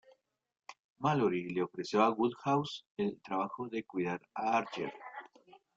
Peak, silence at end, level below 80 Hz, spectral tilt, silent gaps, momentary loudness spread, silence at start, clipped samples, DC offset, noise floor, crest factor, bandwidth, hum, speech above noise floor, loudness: -14 dBFS; 0.5 s; -76 dBFS; -6.5 dB/octave; 0.79-0.96 s, 2.86-2.97 s; 18 LU; 0.7 s; under 0.1%; under 0.1%; -68 dBFS; 20 dB; 7.8 kHz; none; 34 dB; -34 LUFS